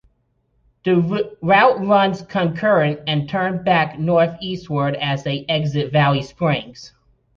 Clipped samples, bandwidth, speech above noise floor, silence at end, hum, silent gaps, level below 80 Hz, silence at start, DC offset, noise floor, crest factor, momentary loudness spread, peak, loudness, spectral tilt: under 0.1%; 7.2 kHz; 47 dB; 0.5 s; none; none; -54 dBFS; 0.85 s; under 0.1%; -65 dBFS; 16 dB; 8 LU; -2 dBFS; -18 LUFS; -7 dB/octave